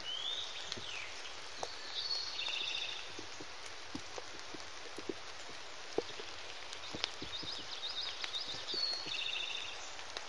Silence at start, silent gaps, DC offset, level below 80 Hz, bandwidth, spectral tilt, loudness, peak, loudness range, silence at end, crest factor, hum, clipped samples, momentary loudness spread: 0 s; none; 0.4%; -72 dBFS; 11.5 kHz; -1 dB/octave; -40 LUFS; -12 dBFS; 7 LU; 0 s; 32 dB; none; under 0.1%; 10 LU